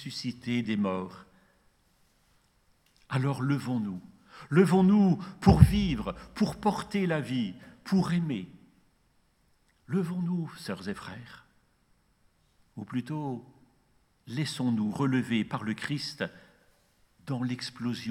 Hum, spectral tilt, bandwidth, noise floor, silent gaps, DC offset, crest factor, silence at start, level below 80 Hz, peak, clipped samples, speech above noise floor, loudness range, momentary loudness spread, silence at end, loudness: none; -7 dB/octave; 13 kHz; -68 dBFS; none; under 0.1%; 28 dB; 0 s; -46 dBFS; -2 dBFS; under 0.1%; 40 dB; 13 LU; 17 LU; 0 s; -29 LUFS